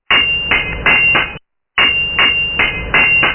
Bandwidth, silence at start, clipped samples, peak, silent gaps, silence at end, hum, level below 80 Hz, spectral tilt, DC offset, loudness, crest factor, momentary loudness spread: 3.2 kHz; 0.1 s; under 0.1%; 0 dBFS; none; 0 s; none; -32 dBFS; -6 dB/octave; under 0.1%; -11 LUFS; 14 dB; 5 LU